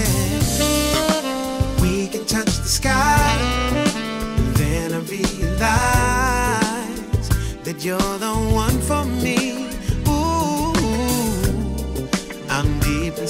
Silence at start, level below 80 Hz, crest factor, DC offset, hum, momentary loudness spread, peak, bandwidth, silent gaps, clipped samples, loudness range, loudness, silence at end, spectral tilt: 0 s; -28 dBFS; 16 dB; under 0.1%; none; 8 LU; -4 dBFS; 16 kHz; none; under 0.1%; 2 LU; -20 LUFS; 0 s; -4.5 dB/octave